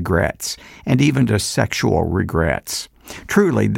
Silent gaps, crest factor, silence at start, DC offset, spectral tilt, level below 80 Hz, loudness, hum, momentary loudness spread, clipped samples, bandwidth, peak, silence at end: none; 16 dB; 0 s; under 0.1%; -5.5 dB/octave; -36 dBFS; -19 LUFS; none; 11 LU; under 0.1%; 17 kHz; -2 dBFS; 0 s